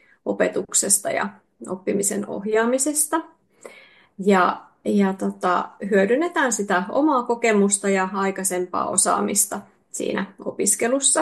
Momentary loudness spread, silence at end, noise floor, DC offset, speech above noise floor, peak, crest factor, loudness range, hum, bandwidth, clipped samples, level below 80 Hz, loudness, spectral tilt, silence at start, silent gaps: 10 LU; 0 s; -50 dBFS; under 0.1%; 28 dB; -2 dBFS; 20 dB; 2 LU; none; 12.5 kHz; under 0.1%; -68 dBFS; -21 LUFS; -3.5 dB/octave; 0.25 s; none